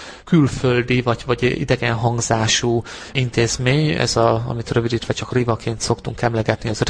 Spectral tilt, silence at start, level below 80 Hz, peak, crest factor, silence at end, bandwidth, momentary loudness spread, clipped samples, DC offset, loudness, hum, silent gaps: -5 dB/octave; 0 s; -40 dBFS; -2 dBFS; 18 dB; 0 s; 10.5 kHz; 6 LU; under 0.1%; under 0.1%; -19 LUFS; none; none